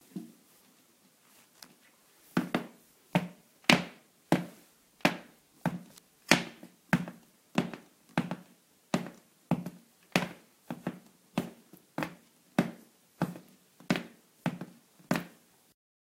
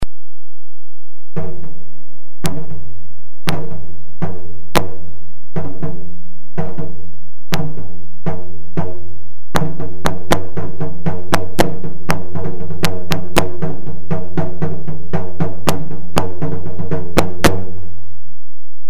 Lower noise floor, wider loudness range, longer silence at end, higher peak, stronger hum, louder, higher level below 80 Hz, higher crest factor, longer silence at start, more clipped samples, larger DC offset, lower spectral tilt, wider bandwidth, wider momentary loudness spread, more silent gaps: first, -65 dBFS vs -51 dBFS; about the same, 7 LU vs 8 LU; first, 0.75 s vs 0.45 s; about the same, 0 dBFS vs 0 dBFS; neither; second, -33 LUFS vs -23 LUFS; second, -70 dBFS vs -36 dBFS; first, 36 dB vs 26 dB; first, 0.15 s vs 0 s; neither; second, under 0.1% vs 50%; about the same, -4.5 dB/octave vs -5.5 dB/octave; first, 16 kHz vs 13.5 kHz; first, 24 LU vs 18 LU; neither